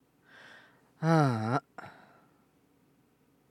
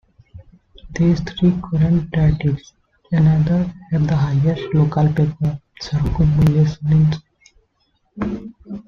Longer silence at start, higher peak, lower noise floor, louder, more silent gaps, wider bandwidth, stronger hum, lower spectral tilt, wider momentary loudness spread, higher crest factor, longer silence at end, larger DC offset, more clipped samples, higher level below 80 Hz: first, 1 s vs 0.35 s; second, -10 dBFS vs -2 dBFS; about the same, -68 dBFS vs -65 dBFS; second, -29 LUFS vs -18 LUFS; neither; first, 11 kHz vs 6.6 kHz; neither; about the same, -7.5 dB/octave vs -8.5 dB/octave; first, 27 LU vs 11 LU; first, 24 dB vs 16 dB; first, 1.6 s vs 0.05 s; neither; neither; second, -82 dBFS vs -36 dBFS